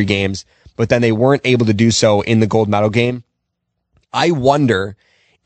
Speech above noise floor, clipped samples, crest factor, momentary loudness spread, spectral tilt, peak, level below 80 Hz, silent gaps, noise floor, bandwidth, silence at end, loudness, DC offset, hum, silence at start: 59 dB; under 0.1%; 16 dB; 10 LU; -5.5 dB/octave; 0 dBFS; -48 dBFS; none; -73 dBFS; 8.8 kHz; 0.55 s; -15 LUFS; under 0.1%; none; 0 s